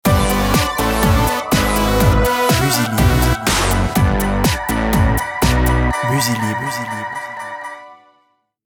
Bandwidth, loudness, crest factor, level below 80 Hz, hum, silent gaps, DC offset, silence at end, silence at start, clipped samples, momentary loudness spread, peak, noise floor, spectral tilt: 19.5 kHz; -16 LUFS; 14 dB; -24 dBFS; none; none; under 0.1%; 0.8 s; 0.05 s; under 0.1%; 10 LU; -2 dBFS; -61 dBFS; -4.5 dB/octave